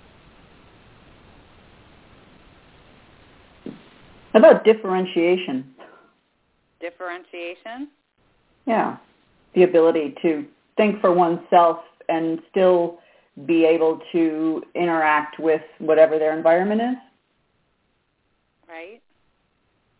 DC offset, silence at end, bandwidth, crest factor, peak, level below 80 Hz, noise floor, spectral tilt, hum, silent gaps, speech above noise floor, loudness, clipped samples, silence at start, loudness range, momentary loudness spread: under 0.1%; 1.1 s; 4 kHz; 22 dB; 0 dBFS; -64 dBFS; -69 dBFS; -10 dB/octave; none; none; 50 dB; -19 LUFS; under 0.1%; 3.65 s; 11 LU; 21 LU